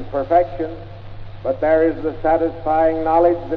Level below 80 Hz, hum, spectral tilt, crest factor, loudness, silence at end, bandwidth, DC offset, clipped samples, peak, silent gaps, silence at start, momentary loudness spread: -38 dBFS; 50 Hz at -35 dBFS; -9.5 dB/octave; 14 dB; -18 LUFS; 0 s; 5.4 kHz; under 0.1%; under 0.1%; -4 dBFS; none; 0 s; 19 LU